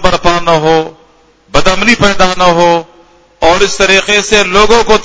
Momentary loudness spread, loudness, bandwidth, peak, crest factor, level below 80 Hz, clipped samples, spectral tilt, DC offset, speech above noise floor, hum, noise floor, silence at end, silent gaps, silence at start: 6 LU; -8 LUFS; 8 kHz; 0 dBFS; 8 dB; -28 dBFS; 2%; -3.5 dB/octave; under 0.1%; 37 dB; none; -45 dBFS; 0 s; none; 0 s